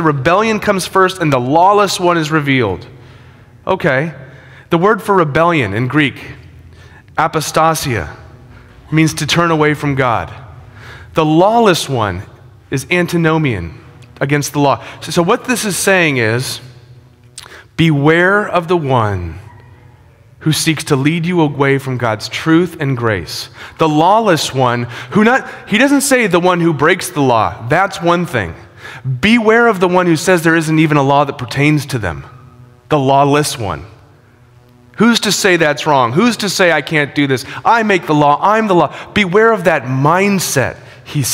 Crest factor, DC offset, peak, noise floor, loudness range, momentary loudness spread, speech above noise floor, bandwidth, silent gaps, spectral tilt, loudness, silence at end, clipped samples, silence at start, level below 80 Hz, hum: 14 dB; under 0.1%; 0 dBFS; -45 dBFS; 4 LU; 11 LU; 32 dB; 16.5 kHz; none; -5 dB/octave; -13 LUFS; 0 s; under 0.1%; 0 s; -44 dBFS; none